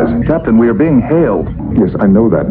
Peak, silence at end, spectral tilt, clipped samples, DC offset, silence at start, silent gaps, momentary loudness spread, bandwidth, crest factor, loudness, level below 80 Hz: 0 dBFS; 0 s; -13 dB/octave; under 0.1%; under 0.1%; 0 s; none; 4 LU; 4 kHz; 10 dB; -11 LUFS; -28 dBFS